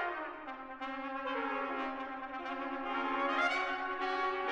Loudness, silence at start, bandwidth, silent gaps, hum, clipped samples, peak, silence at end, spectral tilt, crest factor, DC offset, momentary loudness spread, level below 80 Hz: -36 LUFS; 0 s; 10.5 kHz; none; none; under 0.1%; -20 dBFS; 0 s; -3 dB/octave; 16 dB; under 0.1%; 10 LU; -68 dBFS